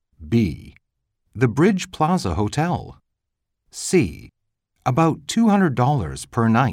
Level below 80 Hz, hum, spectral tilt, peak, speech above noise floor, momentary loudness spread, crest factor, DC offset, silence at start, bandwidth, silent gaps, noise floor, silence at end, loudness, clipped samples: -44 dBFS; none; -6.5 dB/octave; -4 dBFS; 59 dB; 10 LU; 16 dB; under 0.1%; 0.2 s; 15 kHz; none; -79 dBFS; 0 s; -20 LUFS; under 0.1%